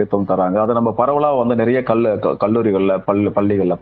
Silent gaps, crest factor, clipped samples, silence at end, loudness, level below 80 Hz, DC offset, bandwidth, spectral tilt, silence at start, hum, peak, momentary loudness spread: none; 16 dB; under 0.1%; 0 s; -16 LUFS; -52 dBFS; under 0.1%; 4.7 kHz; -11 dB/octave; 0 s; none; 0 dBFS; 1 LU